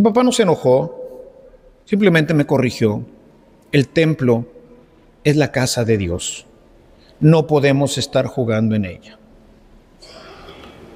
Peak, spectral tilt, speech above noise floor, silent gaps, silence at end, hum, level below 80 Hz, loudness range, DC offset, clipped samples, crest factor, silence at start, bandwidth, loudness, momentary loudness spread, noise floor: 0 dBFS; -6 dB/octave; 33 dB; none; 0.1 s; none; -50 dBFS; 2 LU; under 0.1%; under 0.1%; 18 dB; 0 s; 15.5 kHz; -17 LUFS; 21 LU; -48 dBFS